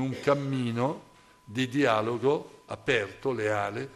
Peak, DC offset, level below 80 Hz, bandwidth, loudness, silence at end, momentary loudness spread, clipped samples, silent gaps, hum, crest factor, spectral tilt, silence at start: -12 dBFS; under 0.1%; -64 dBFS; 13 kHz; -28 LUFS; 0 s; 9 LU; under 0.1%; none; none; 18 dB; -6 dB/octave; 0 s